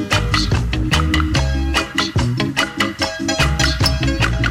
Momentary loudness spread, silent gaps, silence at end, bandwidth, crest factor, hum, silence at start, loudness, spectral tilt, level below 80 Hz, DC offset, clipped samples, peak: 3 LU; none; 0 s; 16.5 kHz; 12 dB; none; 0 s; -17 LUFS; -4.5 dB/octave; -24 dBFS; under 0.1%; under 0.1%; -6 dBFS